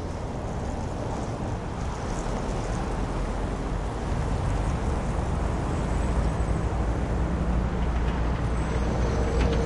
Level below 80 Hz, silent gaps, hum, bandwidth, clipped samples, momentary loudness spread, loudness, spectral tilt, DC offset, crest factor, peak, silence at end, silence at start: -30 dBFS; none; none; 11 kHz; under 0.1%; 5 LU; -29 LUFS; -7 dB/octave; under 0.1%; 14 dB; -12 dBFS; 0 s; 0 s